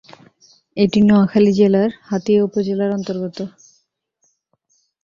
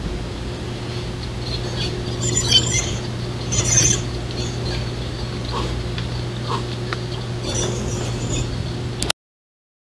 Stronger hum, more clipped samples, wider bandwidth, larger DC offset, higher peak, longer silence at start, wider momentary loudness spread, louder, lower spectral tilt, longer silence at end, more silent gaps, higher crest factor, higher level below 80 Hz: neither; neither; second, 7.2 kHz vs 12 kHz; second, under 0.1% vs 0.1%; about the same, -2 dBFS vs 0 dBFS; first, 0.75 s vs 0 s; about the same, 14 LU vs 13 LU; first, -16 LUFS vs -22 LUFS; first, -7.5 dB/octave vs -3 dB/octave; first, 1.55 s vs 0.85 s; neither; second, 16 dB vs 24 dB; second, -56 dBFS vs -34 dBFS